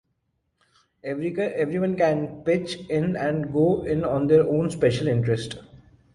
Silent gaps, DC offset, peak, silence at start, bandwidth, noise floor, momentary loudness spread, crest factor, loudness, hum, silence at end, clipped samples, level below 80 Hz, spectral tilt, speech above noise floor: none; under 0.1%; -6 dBFS; 1.05 s; 11.5 kHz; -74 dBFS; 9 LU; 18 dB; -24 LUFS; none; 0.35 s; under 0.1%; -52 dBFS; -7.5 dB/octave; 51 dB